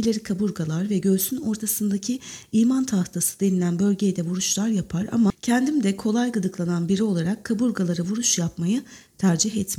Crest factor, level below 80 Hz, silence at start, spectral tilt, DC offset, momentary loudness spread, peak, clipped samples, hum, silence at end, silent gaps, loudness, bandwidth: 16 dB; -56 dBFS; 0 s; -5 dB/octave; under 0.1%; 5 LU; -6 dBFS; under 0.1%; none; 0 s; none; -23 LUFS; 17 kHz